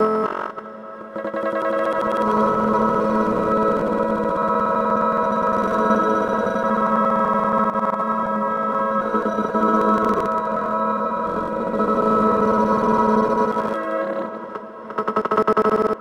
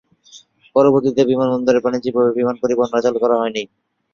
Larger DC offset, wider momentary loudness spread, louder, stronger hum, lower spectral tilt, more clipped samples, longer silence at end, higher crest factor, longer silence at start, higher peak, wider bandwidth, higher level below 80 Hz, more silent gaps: neither; about the same, 8 LU vs 6 LU; second, -20 LUFS vs -17 LUFS; neither; about the same, -7.5 dB/octave vs -6.5 dB/octave; neither; second, 0 s vs 0.5 s; about the same, 16 dB vs 16 dB; second, 0 s vs 0.35 s; about the same, -4 dBFS vs -2 dBFS; first, 11 kHz vs 7.2 kHz; first, -50 dBFS vs -60 dBFS; neither